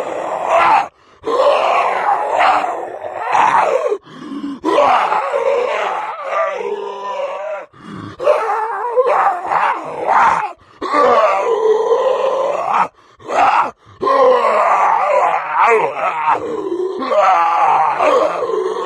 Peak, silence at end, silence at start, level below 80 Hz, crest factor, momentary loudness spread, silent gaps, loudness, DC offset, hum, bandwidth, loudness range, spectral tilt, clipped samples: -2 dBFS; 0 s; 0 s; -60 dBFS; 14 dB; 11 LU; none; -15 LUFS; under 0.1%; none; 11.5 kHz; 4 LU; -4 dB/octave; under 0.1%